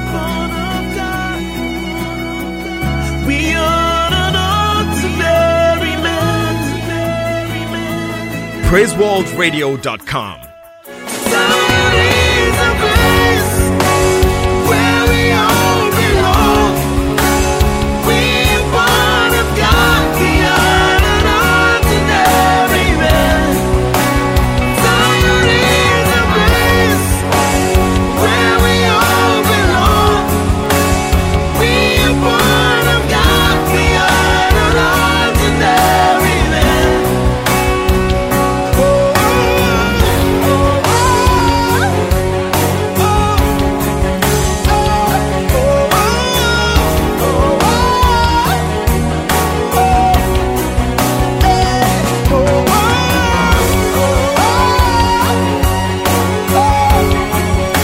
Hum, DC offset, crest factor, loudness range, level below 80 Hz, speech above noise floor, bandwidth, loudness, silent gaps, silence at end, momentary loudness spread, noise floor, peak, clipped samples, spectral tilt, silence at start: none; under 0.1%; 12 dB; 4 LU; -20 dBFS; 20 dB; 16.5 kHz; -12 LUFS; none; 0 s; 7 LU; -34 dBFS; 0 dBFS; under 0.1%; -4.5 dB/octave; 0 s